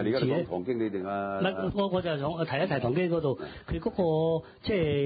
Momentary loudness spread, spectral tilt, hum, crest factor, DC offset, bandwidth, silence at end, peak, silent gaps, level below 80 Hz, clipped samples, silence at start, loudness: 5 LU; -11 dB/octave; none; 14 dB; under 0.1%; 5 kHz; 0 s; -16 dBFS; none; -50 dBFS; under 0.1%; 0 s; -29 LUFS